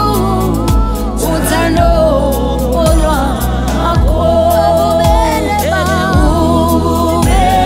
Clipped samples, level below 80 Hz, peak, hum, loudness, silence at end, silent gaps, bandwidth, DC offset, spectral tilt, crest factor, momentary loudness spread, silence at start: under 0.1%; -16 dBFS; 0 dBFS; none; -12 LUFS; 0 s; none; 16.5 kHz; under 0.1%; -6 dB/octave; 10 dB; 4 LU; 0 s